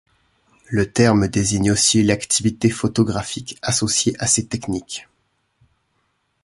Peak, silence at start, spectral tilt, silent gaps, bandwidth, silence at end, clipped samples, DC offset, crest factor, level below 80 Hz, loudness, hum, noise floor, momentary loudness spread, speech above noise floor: -2 dBFS; 0.7 s; -4 dB/octave; none; 11.5 kHz; 1.4 s; under 0.1%; under 0.1%; 18 dB; -44 dBFS; -18 LUFS; none; -68 dBFS; 11 LU; 49 dB